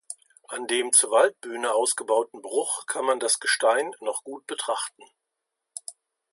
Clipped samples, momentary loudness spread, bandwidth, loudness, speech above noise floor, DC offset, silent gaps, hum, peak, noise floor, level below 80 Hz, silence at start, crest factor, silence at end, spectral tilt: under 0.1%; 20 LU; 12 kHz; -24 LUFS; 58 dB; under 0.1%; none; none; -6 dBFS; -83 dBFS; -86 dBFS; 0.1 s; 22 dB; 0.4 s; 1 dB/octave